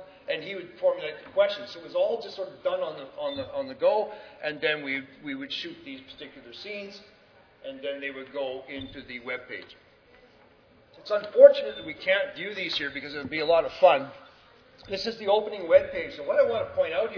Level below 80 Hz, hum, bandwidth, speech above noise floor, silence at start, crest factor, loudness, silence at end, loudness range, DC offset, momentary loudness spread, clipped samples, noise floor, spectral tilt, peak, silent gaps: -64 dBFS; none; 5.4 kHz; 31 dB; 0 s; 26 dB; -27 LUFS; 0 s; 14 LU; under 0.1%; 17 LU; under 0.1%; -58 dBFS; -5 dB/octave; -2 dBFS; none